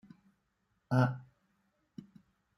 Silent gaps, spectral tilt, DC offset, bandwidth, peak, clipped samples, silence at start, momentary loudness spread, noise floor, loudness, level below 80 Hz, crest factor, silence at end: none; -8.5 dB/octave; under 0.1%; 11 kHz; -14 dBFS; under 0.1%; 0.9 s; 24 LU; -79 dBFS; -32 LUFS; -74 dBFS; 24 dB; 1.35 s